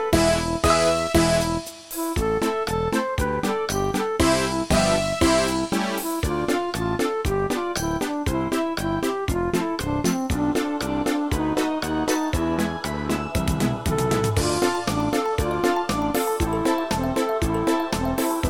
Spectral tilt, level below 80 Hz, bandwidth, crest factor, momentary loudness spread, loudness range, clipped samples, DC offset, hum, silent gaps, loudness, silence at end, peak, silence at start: -5 dB/octave; -36 dBFS; 17 kHz; 18 dB; 6 LU; 3 LU; under 0.1%; 0.3%; none; none; -23 LUFS; 0 s; -4 dBFS; 0 s